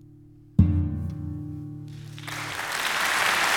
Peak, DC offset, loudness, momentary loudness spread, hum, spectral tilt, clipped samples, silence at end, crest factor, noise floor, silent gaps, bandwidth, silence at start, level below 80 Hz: -6 dBFS; under 0.1%; -26 LUFS; 17 LU; none; -4 dB/octave; under 0.1%; 0 s; 22 dB; -50 dBFS; none; 18 kHz; 0.1 s; -40 dBFS